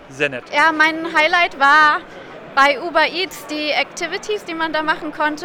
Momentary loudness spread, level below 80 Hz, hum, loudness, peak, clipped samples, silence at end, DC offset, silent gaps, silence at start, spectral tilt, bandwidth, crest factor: 11 LU; -54 dBFS; none; -16 LUFS; -2 dBFS; under 0.1%; 0 s; under 0.1%; none; 0 s; -2.5 dB/octave; 19.5 kHz; 14 dB